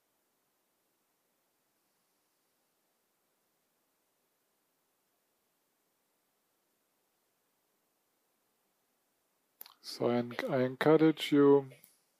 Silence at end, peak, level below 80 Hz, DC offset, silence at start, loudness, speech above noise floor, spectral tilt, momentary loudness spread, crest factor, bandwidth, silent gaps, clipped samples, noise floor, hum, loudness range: 0.5 s; -12 dBFS; under -90 dBFS; under 0.1%; 9.85 s; -29 LUFS; 51 dB; -6.5 dB/octave; 11 LU; 24 dB; 15.5 kHz; none; under 0.1%; -79 dBFS; none; 11 LU